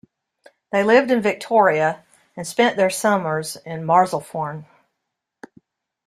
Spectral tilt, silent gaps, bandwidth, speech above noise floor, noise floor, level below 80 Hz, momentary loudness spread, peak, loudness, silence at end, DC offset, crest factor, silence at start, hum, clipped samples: -4.5 dB/octave; none; 15.5 kHz; 61 dB; -79 dBFS; -66 dBFS; 14 LU; -2 dBFS; -19 LUFS; 1.45 s; under 0.1%; 18 dB; 0.75 s; none; under 0.1%